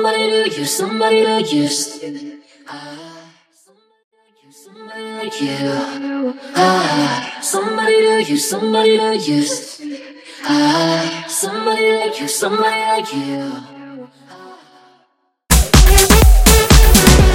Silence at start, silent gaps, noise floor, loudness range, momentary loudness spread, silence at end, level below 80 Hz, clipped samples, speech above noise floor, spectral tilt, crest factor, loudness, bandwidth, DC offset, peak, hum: 0 s; 4.04-4.11 s; -61 dBFS; 13 LU; 22 LU; 0 s; -20 dBFS; under 0.1%; 44 dB; -4 dB/octave; 14 dB; -14 LUFS; 17 kHz; under 0.1%; 0 dBFS; none